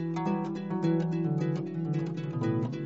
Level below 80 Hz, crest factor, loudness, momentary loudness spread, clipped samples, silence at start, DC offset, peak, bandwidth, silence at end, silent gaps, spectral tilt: -74 dBFS; 14 dB; -31 LUFS; 4 LU; under 0.1%; 0 s; under 0.1%; -18 dBFS; 7.8 kHz; 0 s; none; -9 dB/octave